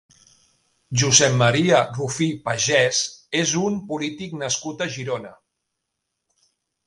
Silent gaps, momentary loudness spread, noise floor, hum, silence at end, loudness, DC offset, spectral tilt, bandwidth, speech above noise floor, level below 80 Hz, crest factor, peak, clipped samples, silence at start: none; 13 LU; -79 dBFS; none; 1.5 s; -20 LUFS; under 0.1%; -3 dB/octave; 11.5 kHz; 58 dB; -58 dBFS; 22 dB; 0 dBFS; under 0.1%; 0.9 s